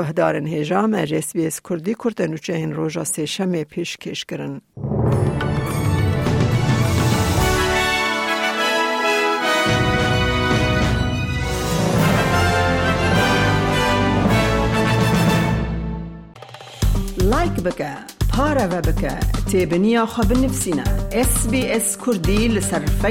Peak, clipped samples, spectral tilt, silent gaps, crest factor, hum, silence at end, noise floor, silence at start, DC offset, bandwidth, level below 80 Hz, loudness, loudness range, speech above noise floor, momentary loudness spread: -4 dBFS; under 0.1%; -5 dB/octave; none; 16 dB; none; 0 s; -38 dBFS; 0 s; under 0.1%; 17 kHz; -28 dBFS; -19 LUFS; 5 LU; 19 dB; 8 LU